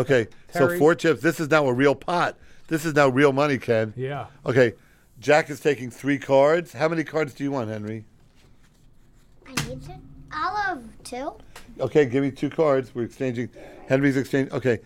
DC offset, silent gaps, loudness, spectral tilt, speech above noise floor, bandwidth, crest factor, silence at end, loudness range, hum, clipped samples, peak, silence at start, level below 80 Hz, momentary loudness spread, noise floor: under 0.1%; none; -23 LUFS; -6 dB/octave; 31 dB; 16.5 kHz; 20 dB; 0.05 s; 11 LU; none; under 0.1%; -4 dBFS; 0 s; -54 dBFS; 14 LU; -53 dBFS